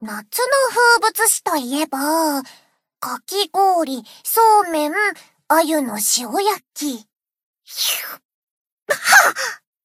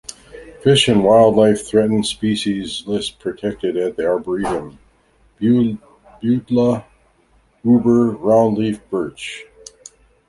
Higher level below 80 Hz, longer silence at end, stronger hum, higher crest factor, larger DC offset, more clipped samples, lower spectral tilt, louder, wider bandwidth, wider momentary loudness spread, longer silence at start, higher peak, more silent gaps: second, -74 dBFS vs -50 dBFS; second, 0.3 s vs 0.85 s; neither; about the same, 18 dB vs 16 dB; neither; neither; second, -0.5 dB/octave vs -5.5 dB/octave; about the same, -17 LUFS vs -17 LUFS; first, 16 kHz vs 11.5 kHz; about the same, 13 LU vs 13 LU; about the same, 0 s vs 0.1 s; about the same, 0 dBFS vs -2 dBFS; first, 7.43-7.54 s, 8.25-8.65 s, 8.72-8.86 s vs none